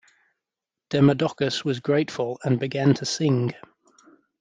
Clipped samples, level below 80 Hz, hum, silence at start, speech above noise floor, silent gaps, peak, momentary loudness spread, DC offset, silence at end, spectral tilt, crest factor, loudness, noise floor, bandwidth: under 0.1%; -64 dBFS; none; 0.9 s; 65 dB; none; -6 dBFS; 8 LU; under 0.1%; 0.85 s; -6 dB/octave; 18 dB; -23 LUFS; -88 dBFS; 9.4 kHz